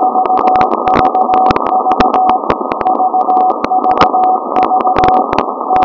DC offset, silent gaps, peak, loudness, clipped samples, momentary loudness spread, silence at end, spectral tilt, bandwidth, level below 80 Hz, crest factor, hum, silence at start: under 0.1%; none; 0 dBFS; -11 LUFS; 0.9%; 4 LU; 0 s; -6.5 dB/octave; 6 kHz; -38 dBFS; 10 dB; none; 0 s